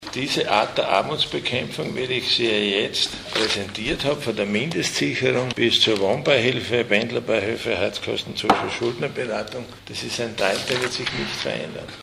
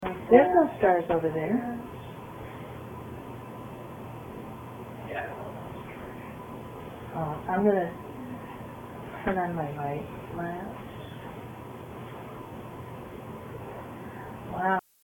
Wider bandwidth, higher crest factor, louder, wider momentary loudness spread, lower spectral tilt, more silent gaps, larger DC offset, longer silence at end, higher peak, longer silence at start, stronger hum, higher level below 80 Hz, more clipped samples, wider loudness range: about the same, 15.5 kHz vs 17 kHz; second, 22 dB vs 28 dB; first, -22 LUFS vs -29 LUFS; second, 8 LU vs 18 LU; second, -3.5 dB/octave vs -8 dB/octave; neither; neither; second, 0 s vs 0.25 s; first, 0 dBFS vs -4 dBFS; about the same, 0 s vs 0 s; neither; about the same, -52 dBFS vs -56 dBFS; neither; second, 4 LU vs 11 LU